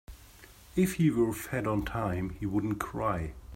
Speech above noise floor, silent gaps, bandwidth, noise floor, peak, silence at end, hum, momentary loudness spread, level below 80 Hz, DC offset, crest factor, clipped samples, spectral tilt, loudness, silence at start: 24 dB; none; 16.5 kHz; -54 dBFS; -14 dBFS; 0 s; none; 7 LU; -48 dBFS; under 0.1%; 16 dB; under 0.1%; -7 dB/octave; -31 LUFS; 0.1 s